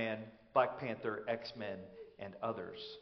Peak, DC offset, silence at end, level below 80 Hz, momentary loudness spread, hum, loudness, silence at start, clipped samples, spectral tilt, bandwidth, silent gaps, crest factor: -18 dBFS; under 0.1%; 0 s; -76 dBFS; 15 LU; none; -40 LUFS; 0 s; under 0.1%; -3.5 dB/octave; 6.2 kHz; none; 22 dB